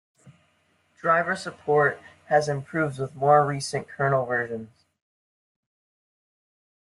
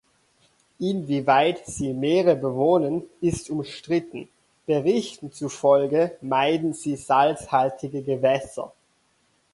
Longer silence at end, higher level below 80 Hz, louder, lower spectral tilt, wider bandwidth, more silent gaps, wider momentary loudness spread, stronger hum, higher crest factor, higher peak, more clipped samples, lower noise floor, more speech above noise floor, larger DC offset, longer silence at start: first, 2.3 s vs 0.85 s; second, -66 dBFS vs -58 dBFS; about the same, -24 LUFS vs -23 LUFS; about the same, -5.5 dB/octave vs -5.5 dB/octave; about the same, 11.5 kHz vs 11.5 kHz; neither; second, 10 LU vs 13 LU; neither; about the same, 22 dB vs 18 dB; about the same, -6 dBFS vs -6 dBFS; neither; about the same, -67 dBFS vs -66 dBFS; about the same, 43 dB vs 43 dB; neither; second, 0.25 s vs 0.8 s